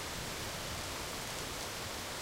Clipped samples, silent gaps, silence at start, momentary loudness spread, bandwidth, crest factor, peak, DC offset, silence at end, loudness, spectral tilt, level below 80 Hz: under 0.1%; none; 0 s; 0 LU; 17 kHz; 16 dB; -26 dBFS; under 0.1%; 0 s; -39 LUFS; -2.5 dB/octave; -54 dBFS